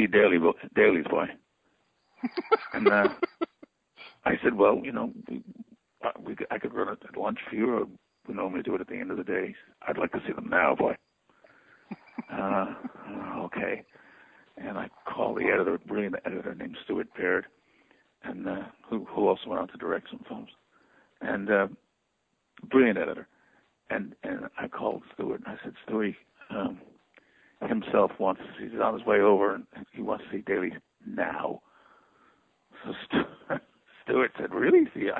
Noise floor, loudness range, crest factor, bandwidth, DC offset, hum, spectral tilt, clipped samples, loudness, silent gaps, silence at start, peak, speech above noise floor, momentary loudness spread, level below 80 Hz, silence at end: -76 dBFS; 8 LU; 22 dB; 5.2 kHz; under 0.1%; none; -8.5 dB/octave; under 0.1%; -29 LUFS; none; 0 s; -8 dBFS; 48 dB; 18 LU; -66 dBFS; 0 s